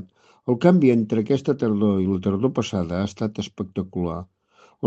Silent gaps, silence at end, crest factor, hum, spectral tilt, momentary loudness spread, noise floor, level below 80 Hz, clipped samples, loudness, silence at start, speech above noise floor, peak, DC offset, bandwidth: none; 0 s; 20 dB; none; -7.5 dB/octave; 12 LU; -57 dBFS; -58 dBFS; under 0.1%; -22 LUFS; 0 s; 36 dB; -2 dBFS; under 0.1%; 8 kHz